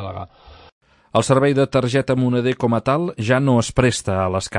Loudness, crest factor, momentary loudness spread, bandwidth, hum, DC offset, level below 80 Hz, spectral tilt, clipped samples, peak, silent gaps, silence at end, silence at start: -18 LUFS; 16 dB; 6 LU; 11.5 kHz; none; under 0.1%; -44 dBFS; -6 dB/octave; under 0.1%; -2 dBFS; 0.72-0.81 s; 0 s; 0 s